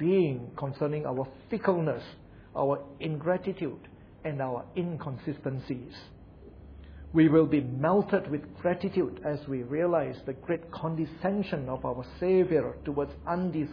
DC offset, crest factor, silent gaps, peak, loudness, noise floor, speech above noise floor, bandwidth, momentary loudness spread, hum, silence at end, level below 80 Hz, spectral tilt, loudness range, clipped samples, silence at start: under 0.1%; 20 dB; none; -10 dBFS; -30 LUFS; -50 dBFS; 21 dB; 5.4 kHz; 13 LU; none; 0 s; -54 dBFS; -10.5 dB/octave; 7 LU; under 0.1%; 0 s